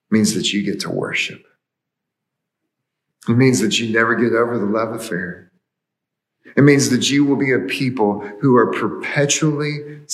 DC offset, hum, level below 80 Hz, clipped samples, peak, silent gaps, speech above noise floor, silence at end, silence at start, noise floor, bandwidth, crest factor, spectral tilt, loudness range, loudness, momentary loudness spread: under 0.1%; none; -70 dBFS; under 0.1%; 0 dBFS; none; 64 dB; 0 s; 0.1 s; -81 dBFS; 13 kHz; 18 dB; -4.5 dB/octave; 5 LU; -17 LUFS; 10 LU